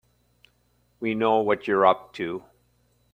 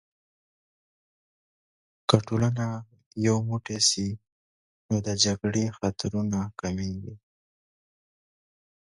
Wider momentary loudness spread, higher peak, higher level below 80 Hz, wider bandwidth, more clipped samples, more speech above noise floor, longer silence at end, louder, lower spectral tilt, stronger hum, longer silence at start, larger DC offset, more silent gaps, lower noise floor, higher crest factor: about the same, 12 LU vs 12 LU; about the same, -4 dBFS vs -2 dBFS; second, -66 dBFS vs -54 dBFS; first, 16 kHz vs 11.5 kHz; neither; second, 43 dB vs over 63 dB; second, 0.75 s vs 1.75 s; first, -24 LUFS vs -27 LUFS; first, -7 dB/octave vs -4.5 dB/octave; first, 60 Hz at -60 dBFS vs none; second, 1 s vs 2.1 s; neither; second, none vs 3.06-3.11 s, 4.32-4.89 s; second, -66 dBFS vs under -90 dBFS; second, 22 dB vs 28 dB